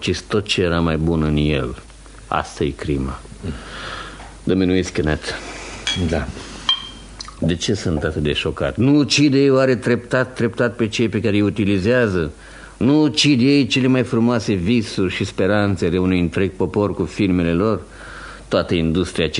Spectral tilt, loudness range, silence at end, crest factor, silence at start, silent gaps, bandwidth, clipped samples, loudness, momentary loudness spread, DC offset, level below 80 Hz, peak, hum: -5.5 dB/octave; 6 LU; 0 s; 16 dB; 0 s; none; 11 kHz; under 0.1%; -18 LUFS; 15 LU; under 0.1%; -36 dBFS; -2 dBFS; none